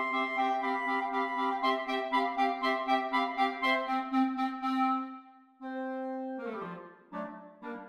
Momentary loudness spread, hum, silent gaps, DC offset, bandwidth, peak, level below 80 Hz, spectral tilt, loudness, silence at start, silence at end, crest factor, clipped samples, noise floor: 14 LU; none; none; under 0.1%; 12 kHz; -16 dBFS; -76 dBFS; -4.5 dB/octave; -31 LUFS; 0 s; 0 s; 16 dB; under 0.1%; -52 dBFS